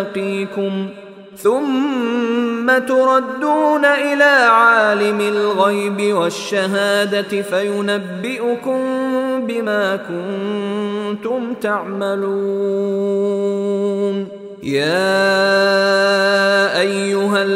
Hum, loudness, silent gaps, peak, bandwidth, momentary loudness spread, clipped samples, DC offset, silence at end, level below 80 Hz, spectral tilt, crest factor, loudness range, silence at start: none; -16 LUFS; none; 0 dBFS; 15.5 kHz; 8 LU; under 0.1%; under 0.1%; 0 s; -68 dBFS; -4.5 dB/octave; 16 dB; 7 LU; 0 s